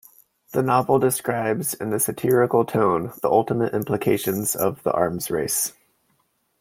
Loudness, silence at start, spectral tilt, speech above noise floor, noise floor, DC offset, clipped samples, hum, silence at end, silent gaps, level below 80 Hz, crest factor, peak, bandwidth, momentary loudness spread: -22 LUFS; 0.5 s; -5 dB/octave; 47 dB; -68 dBFS; under 0.1%; under 0.1%; none; 0.9 s; none; -60 dBFS; 18 dB; -4 dBFS; 16.5 kHz; 6 LU